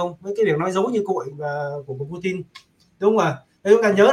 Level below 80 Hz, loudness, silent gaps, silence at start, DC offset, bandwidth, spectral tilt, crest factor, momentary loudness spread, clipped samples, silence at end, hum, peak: -64 dBFS; -21 LUFS; none; 0 s; under 0.1%; 11.5 kHz; -6 dB/octave; 18 dB; 13 LU; under 0.1%; 0 s; none; -2 dBFS